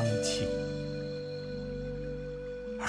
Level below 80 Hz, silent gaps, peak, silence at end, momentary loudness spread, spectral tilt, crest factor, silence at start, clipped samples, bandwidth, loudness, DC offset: -48 dBFS; none; -20 dBFS; 0 s; 9 LU; -5 dB/octave; 16 dB; 0 s; under 0.1%; 11 kHz; -36 LUFS; under 0.1%